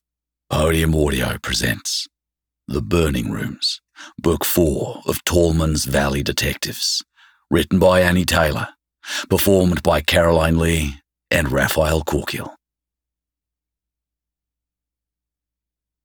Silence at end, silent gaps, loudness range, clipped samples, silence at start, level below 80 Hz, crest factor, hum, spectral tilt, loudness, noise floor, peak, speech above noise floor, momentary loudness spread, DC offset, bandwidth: 3.55 s; none; 6 LU; under 0.1%; 0.5 s; -32 dBFS; 18 dB; none; -4.5 dB/octave; -19 LUFS; -86 dBFS; -2 dBFS; 68 dB; 12 LU; under 0.1%; over 20 kHz